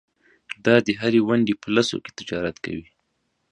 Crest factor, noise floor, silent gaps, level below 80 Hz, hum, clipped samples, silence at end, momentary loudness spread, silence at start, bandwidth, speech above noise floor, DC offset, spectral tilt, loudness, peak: 22 dB; -73 dBFS; none; -56 dBFS; none; under 0.1%; 0.7 s; 14 LU; 0.5 s; 10.5 kHz; 51 dB; under 0.1%; -5.5 dB/octave; -22 LUFS; 0 dBFS